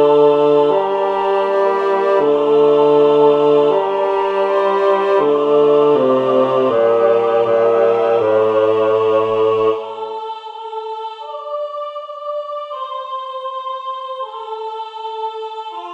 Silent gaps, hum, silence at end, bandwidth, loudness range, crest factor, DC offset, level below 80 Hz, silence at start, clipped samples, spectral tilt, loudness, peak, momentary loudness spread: none; none; 0 s; 6 kHz; 12 LU; 14 dB; under 0.1%; -60 dBFS; 0 s; under 0.1%; -7 dB/octave; -15 LUFS; -2 dBFS; 15 LU